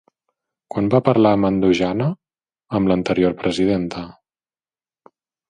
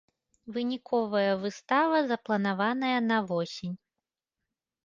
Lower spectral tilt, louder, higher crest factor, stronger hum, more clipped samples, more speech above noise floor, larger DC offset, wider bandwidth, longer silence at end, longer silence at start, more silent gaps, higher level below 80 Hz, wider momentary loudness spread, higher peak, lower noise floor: first, -7.5 dB/octave vs -6 dB/octave; first, -19 LUFS vs -29 LUFS; about the same, 20 dB vs 18 dB; neither; neither; first, over 73 dB vs 60 dB; neither; first, 9.6 kHz vs 7.6 kHz; first, 1.4 s vs 1.1 s; first, 0.75 s vs 0.45 s; neither; first, -48 dBFS vs -74 dBFS; first, 14 LU vs 11 LU; first, 0 dBFS vs -12 dBFS; about the same, under -90 dBFS vs -89 dBFS